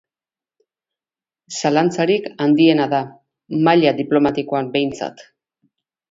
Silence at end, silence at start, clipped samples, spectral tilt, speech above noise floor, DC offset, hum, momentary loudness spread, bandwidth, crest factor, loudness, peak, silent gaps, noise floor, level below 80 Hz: 0.9 s; 1.5 s; under 0.1%; -5.5 dB/octave; over 73 dB; under 0.1%; none; 13 LU; 7.8 kHz; 18 dB; -17 LUFS; 0 dBFS; none; under -90 dBFS; -60 dBFS